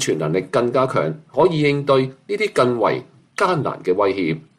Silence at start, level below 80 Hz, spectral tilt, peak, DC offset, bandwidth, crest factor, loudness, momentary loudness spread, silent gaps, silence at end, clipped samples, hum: 0 s; -58 dBFS; -5.5 dB/octave; -4 dBFS; under 0.1%; 14 kHz; 16 dB; -19 LUFS; 6 LU; none; 0.2 s; under 0.1%; none